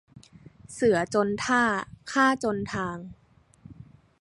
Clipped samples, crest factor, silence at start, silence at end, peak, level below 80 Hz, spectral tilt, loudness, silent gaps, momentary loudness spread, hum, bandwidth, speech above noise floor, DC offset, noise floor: under 0.1%; 20 dB; 0.15 s; 0.35 s; -8 dBFS; -58 dBFS; -4.5 dB/octave; -25 LUFS; none; 14 LU; none; 11.5 kHz; 28 dB; under 0.1%; -54 dBFS